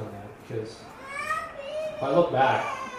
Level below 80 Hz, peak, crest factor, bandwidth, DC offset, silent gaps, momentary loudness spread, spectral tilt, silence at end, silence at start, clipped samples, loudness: -60 dBFS; -8 dBFS; 22 dB; 15 kHz; under 0.1%; none; 17 LU; -5.5 dB/octave; 0 s; 0 s; under 0.1%; -27 LUFS